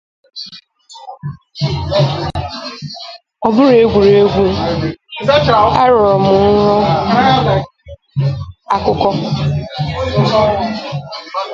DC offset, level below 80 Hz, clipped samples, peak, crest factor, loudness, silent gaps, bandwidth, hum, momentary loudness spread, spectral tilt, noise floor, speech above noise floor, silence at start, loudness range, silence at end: under 0.1%; -34 dBFS; under 0.1%; 0 dBFS; 14 dB; -13 LUFS; none; 7.6 kHz; none; 19 LU; -7 dB/octave; -39 dBFS; 26 dB; 0.35 s; 5 LU; 0 s